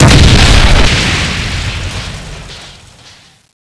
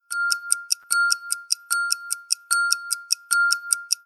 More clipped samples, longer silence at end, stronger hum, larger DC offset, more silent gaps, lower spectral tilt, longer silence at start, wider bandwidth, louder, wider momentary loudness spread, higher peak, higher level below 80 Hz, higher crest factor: first, 1% vs under 0.1%; first, 0.7 s vs 0.1 s; neither; neither; neither; first, -4 dB/octave vs 8 dB/octave; about the same, 0 s vs 0.1 s; second, 11 kHz vs 18 kHz; first, -9 LUFS vs -22 LUFS; first, 22 LU vs 5 LU; about the same, 0 dBFS vs 0 dBFS; first, -14 dBFS vs under -90 dBFS; second, 10 dB vs 24 dB